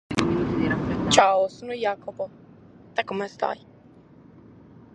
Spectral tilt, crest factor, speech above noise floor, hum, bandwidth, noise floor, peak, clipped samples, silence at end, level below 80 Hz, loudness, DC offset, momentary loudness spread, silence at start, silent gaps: -4.5 dB/octave; 24 dB; 27 dB; none; 11 kHz; -51 dBFS; -2 dBFS; under 0.1%; 1.4 s; -48 dBFS; -24 LUFS; under 0.1%; 16 LU; 0.1 s; none